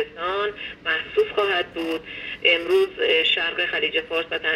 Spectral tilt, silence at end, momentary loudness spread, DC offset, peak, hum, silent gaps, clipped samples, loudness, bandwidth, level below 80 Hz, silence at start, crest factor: -3.5 dB/octave; 0 s; 10 LU; under 0.1%; -4 dBFS; none; none; under 0.1%; -22 LUFS; 14.5 kHz; -56 dBFS; 0 s; 18 dB